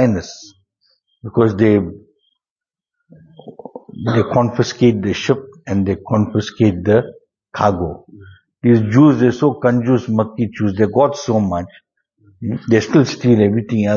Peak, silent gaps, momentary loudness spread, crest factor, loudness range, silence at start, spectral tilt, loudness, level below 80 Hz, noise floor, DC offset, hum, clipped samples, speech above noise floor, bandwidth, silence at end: 0 dBFS; 2.50-2.56 s; 16 LU; 16 dB; 6 LU; 0 s; -7.5 dB/octave; -16 LUFS; -48 dBFS; under -90 dBFS; under 0.1%; none; under 0.1%; over 75 dB; 7.2 kHz; 0 s